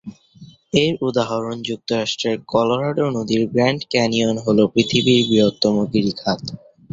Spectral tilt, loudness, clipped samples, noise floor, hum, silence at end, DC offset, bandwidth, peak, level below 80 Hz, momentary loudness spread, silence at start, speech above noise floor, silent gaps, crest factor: -5.5 dB/octave; -19 LUFS; under 0.1%; -45 dBFS; none; 0.35 s; under 0.1%; 7.8 kHz; -2 dBFS; -54 dBFS; 8 LU; 0.05 s; 27 dB; none; 18 dB